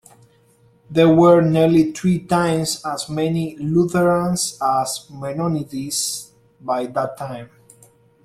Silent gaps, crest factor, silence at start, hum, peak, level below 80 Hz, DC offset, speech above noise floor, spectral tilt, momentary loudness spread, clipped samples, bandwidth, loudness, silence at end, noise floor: none; 18 dB; 0.9 s; none; -2 dBFS; -54 dBFS; under 0.1%; 37 dB; -5.5 dB/octave; 14 LU; under 0.1%; 14.5 kHz; -19 LUFS; 0.8 s; -55 dBFS